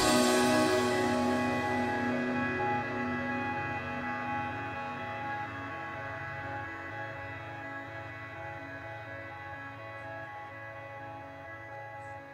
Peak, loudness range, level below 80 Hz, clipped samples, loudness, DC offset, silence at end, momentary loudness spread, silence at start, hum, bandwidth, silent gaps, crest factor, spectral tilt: -14 dBFS; 12 LU; -62 dBFS; under 0.1%; -34 LUFS; under 0.1%; 0 s; 16 LU; 0 s; none; 16 kHz; none; 20 dB; -4 dB/octave